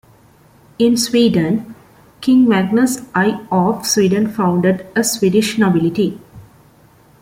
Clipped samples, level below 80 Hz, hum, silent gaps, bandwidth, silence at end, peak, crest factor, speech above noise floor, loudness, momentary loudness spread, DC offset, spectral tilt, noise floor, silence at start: under 0.1%; -52 dBFS; none; none; 16.5 kHz; 0.8 s; -2 dBFS; 14 dB; 34 dB; -15 LUFS; 6 LU; under 0.1%; -5 dB/octave; -48 dBFS; 0.8 s